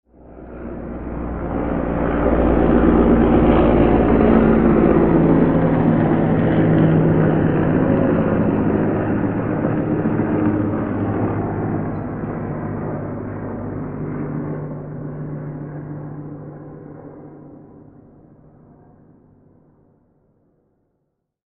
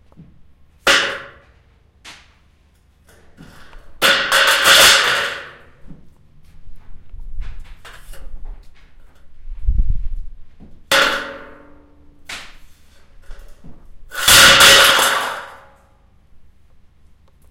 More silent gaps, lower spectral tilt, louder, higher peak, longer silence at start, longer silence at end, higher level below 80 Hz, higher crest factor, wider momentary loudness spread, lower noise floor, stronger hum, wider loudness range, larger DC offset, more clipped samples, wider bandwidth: neither; first, -9 dB/octave vs -0.5 dB/octave; second, -18 LUFS vs -11 LUFS; about the same, 0 dBFS vs 0 dBFS; about the same, 0.3 s vs 0.2 s; first, 3.85 s vs 1.15 s; about the same, -32 dBFS vs -30 dBFS; about the same, 18 dB vs 18 dB; second, 17 LU vs 26 LU; first, -73 dBFS vs -54 dBFS; neither; about the same, 17 LU vs 19 LU; neither; neither; second, 3.9 kHz vs 17 kHz